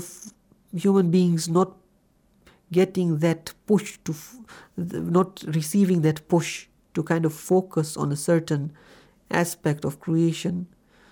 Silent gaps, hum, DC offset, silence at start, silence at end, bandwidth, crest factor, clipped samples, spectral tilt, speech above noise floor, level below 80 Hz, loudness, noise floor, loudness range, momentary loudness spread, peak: none; none; under 0.1%; 0 s; 0.45 s; over 20 kHz; 18 dB; under 0.1%; -6.5 dB/octave; 39 dB; -64 dBFS; -24 LUFS; -63 dBFS; 2 LU; 14 LU; -6 dBFS